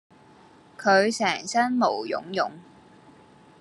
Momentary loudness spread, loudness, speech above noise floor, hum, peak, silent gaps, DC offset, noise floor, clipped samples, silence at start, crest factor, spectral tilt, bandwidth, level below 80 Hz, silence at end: 9 LU; -24 LUFS; 29 dB; none; -8 dBFS; none; under 0.1%; -53 dBFS; under 0.1%; 0.8 s; 20 dB; -3.5 dB/octave; 12 kHz; -74 dBFS; 1 s